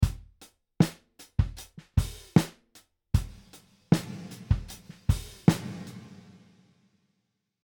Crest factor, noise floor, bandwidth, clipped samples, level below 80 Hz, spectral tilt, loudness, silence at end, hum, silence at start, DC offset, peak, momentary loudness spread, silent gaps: 26 dB; -79 dBFS; 19.5 kHz; under 0.1%; -38 dBFS; -6.5 dB/octave; -29 LUFS; 1.55 s; none; 0 s; under 0.1%; -4 dBFS; 19 LU; none